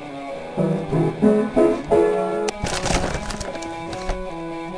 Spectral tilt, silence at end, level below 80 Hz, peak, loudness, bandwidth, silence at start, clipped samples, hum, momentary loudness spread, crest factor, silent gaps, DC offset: -5.5 dB/octave; 0 s; -36 dBFS; -4 dBFS; -22 LUFS; 10.5 kHz; 0 s; under 0.1%; none; 12 LU; 18 dB; none; under 0.1%